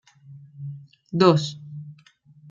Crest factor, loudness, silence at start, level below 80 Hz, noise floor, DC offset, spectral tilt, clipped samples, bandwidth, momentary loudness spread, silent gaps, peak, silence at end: 22 dB; -21 LUFS; 0.3 s; -68 dBFS; -54 dBFS; under 0.1%; -6.5 dB/octave; under 0.1%; 7.6 kHz; 24 LU; none; -4 dBFS; 0.55 s